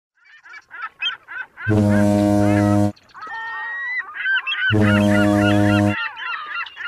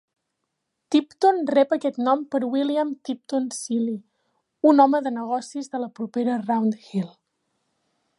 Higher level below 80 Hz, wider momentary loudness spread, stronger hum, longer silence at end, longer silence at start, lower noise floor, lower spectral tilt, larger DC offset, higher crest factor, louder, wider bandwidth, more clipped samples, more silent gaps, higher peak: first, -46 dBFS vs -80 dBFS; first, 15 LU vs 11 LU; neither; second, 0 s vs 1.1 s; second, 0.5 s vs 0.9 s; second, -43 dBFS vs -79 dBFS; about the same, -6.5 dB/octave vs -5.5 dB/octave; neither; about the same, 16 dB vs 20 dB; first, -19 LUFS vs -23 LUFS; first, 13.5 kHz vs 11.5 kHz; neither; neither; about the same, -4 dBFS vs -4 dBFS